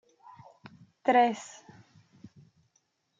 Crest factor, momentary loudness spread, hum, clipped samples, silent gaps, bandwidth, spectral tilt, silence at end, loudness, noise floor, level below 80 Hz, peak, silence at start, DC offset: 22 dB; 27 LU; none; under 0.1%; none; 7.8 kHz; -4.5 dB/octave; 1.75 s; -27 LUFS; -74 dBFS; -82 dBFS; -12 dBFS; 1.05 s; under 0.1%